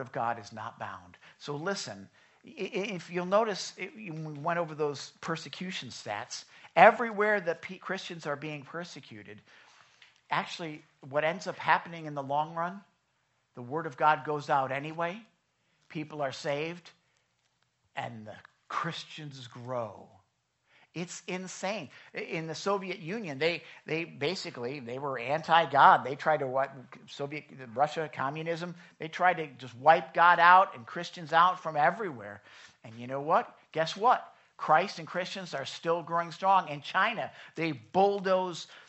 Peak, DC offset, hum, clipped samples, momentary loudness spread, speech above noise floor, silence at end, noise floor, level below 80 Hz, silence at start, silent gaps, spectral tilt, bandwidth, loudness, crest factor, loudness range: -4 dBFS; under 0.1%; none; under 0.1%; 18 LU; 45 dB; 0.05 s; -75 dBFS; -82 dBFS; 0 s; none; -4.5 dB/octave; 8.2 kHz; -30 LUFS; 28 dB; 13 LU